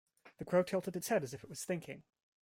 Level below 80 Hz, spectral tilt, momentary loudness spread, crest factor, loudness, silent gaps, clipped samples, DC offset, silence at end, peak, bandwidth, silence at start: -74 dBFS; -5 dB/octave; 18 LU; 18 dB; -37 LUFS; none; under 0.1%; under 0.1%; 0.4 s; -20 dBFS; 16.5 kHz; 0.25 s